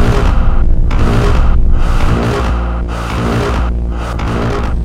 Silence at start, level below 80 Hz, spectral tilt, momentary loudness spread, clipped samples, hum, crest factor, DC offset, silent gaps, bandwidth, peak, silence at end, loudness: 0 s; -12 dBFS; -7 dB/octave; 6 LU; 0.3%; none; 10 dB; under 0.1%; none; 9.8 kHz; 0 dBFS; 0 s; -15 LUFS